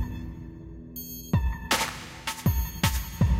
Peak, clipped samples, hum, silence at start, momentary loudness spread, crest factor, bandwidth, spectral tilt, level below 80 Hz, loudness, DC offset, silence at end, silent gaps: -10 dBFS; under 0.1%; none; 0 s; 14 LU; 18 dB; 16 kHz; -4.5 dB/octave; -34 dBFS; -29 LUFS; under 0.1%; 0 s; none